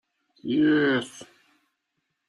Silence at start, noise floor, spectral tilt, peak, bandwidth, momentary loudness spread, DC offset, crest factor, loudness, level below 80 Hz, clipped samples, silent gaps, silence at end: 0.45 s; -79 dBFS; -5.5 dB/octave; -12 dBFS; 11.5 kHz; 19 LU; under 0.1%; 16 dB; -23 LUFS; -68 dBFS; under 0.1%; none; 1.05 s